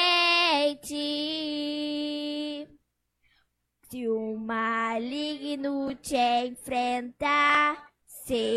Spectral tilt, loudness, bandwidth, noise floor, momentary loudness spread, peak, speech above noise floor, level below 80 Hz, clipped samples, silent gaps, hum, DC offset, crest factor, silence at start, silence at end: -2.5 dB/octave; -27 LUFS; 15 kHz; -73 dBFS; 14 LU; -12 dBFS; 46 dB; -64 dBFS; under 0.1%; none; none; under 0.1%; 18 dB; 0 s; 0 s